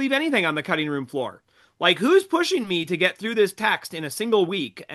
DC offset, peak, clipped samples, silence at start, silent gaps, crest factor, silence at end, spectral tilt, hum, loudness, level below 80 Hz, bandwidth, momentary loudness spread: under 0.1%; -4 dBFS; under 0.1%; 0 s; none; 18 dB; 0 s; -4 dB/octave; none; -22 LUFS; -72 dBFS; 12.5 kHz; 10 LU